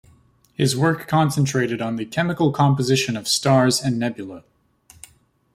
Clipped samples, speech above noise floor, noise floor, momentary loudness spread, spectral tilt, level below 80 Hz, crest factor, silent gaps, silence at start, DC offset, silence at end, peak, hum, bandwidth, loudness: under 0.1%; 36 dB; -55 dBFS; 9 LU; -5 dB/octave; -56 dBFS; 16 dB; none; 0.6 s; under 0.1%; 1.15 s; -4 dBFS; none; 16 kHz; -20 LUFS